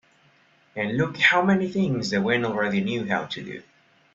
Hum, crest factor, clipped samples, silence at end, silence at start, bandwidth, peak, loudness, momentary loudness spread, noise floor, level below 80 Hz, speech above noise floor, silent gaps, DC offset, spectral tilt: none; 22 dB; under 0.1%; 0.55 s; 0.75 s; 7.8 kHz; -4 dBFS; -23 LUFS; 15 LU; -60 dBFS; -62 dBFS; 36 dB; none; under 0.1%; -5.5 dB/octave